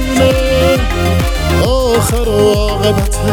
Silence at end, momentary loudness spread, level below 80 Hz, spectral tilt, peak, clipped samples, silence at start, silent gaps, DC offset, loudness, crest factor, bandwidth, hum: 0 s; 3 LU; -18 dBFS; -5 dB/octave; 0 dBFS; under 0.1%; 0 s; none; under 0.1%; -12 LUFS; 12 dB; 19 kHz; none